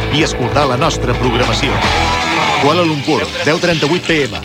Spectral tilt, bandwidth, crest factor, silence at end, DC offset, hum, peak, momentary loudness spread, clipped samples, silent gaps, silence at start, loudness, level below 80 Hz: -4.5 dB/octave; 16.5 kHz; 14 dB; 0 s; under 0.1%; none; 0 dBFS; 3 LU; under 0.1%; none; 0 s; -13 LUFS; -28 dBFS